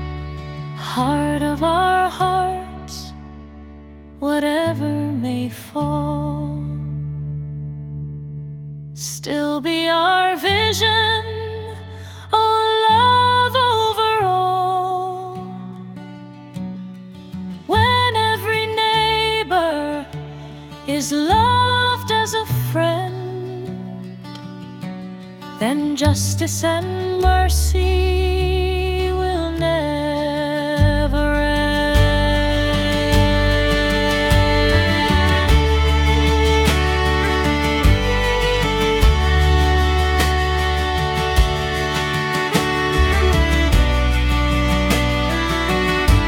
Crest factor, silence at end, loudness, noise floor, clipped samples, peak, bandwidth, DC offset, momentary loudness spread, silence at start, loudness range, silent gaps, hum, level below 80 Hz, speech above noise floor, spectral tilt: 16 dB; 0 s; -18 LUFS; -39 dBFS; under 0.1%; -2 dBFS; 17.5 kHz; under 0.1%; 16 LU; 0 s; 8 LU; none; none; -24 dBFS; 22 dB; -5 dB/octave